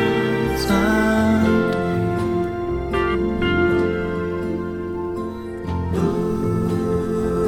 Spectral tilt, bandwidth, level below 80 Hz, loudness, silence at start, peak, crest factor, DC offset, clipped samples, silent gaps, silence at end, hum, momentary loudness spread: -7 dB/octave; 17 kHz; -36 dBFS; -21 LUFS; 0 s; -6 dBFS; 14 dB; under 0.1%; under 0.1%; none; 0 s; none; 9 LU